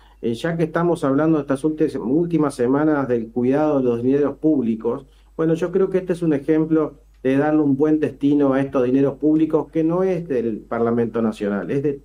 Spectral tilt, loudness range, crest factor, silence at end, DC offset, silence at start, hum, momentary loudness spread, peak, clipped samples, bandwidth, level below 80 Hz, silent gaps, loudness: -8.5 dB/octave; 2 LU; 16 dB; 0.05 s; under 0.1%; 0.2 s; none; 6 LU; -4 dBFS; under 0.1%; 10.5 kHz; -50 dBFS; none; -20 LUFS